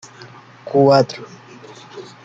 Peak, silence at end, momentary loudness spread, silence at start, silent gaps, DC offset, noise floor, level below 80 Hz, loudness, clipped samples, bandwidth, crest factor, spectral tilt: -2 dBFS; 0.25 s; 26 LU; 0.65 s; none; under 0.1%; -41 dBFS; -62 dBFS; -15 LUFS; under 0.1%; 7.8 kHz; 18 dB; -6.5 dB/octave